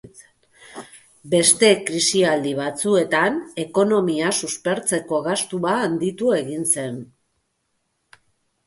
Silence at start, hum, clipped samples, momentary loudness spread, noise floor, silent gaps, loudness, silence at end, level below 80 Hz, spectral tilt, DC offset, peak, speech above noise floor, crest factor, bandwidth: 0.2 s; none; under 0.1%; 11 LU; -72 dBFS; none; -20 LUFS; 1.6 s; -64 dBFS; -3 dB/octave; under 0.1%; -2 dBFS; 52 dB; 20 dB; 12 kHz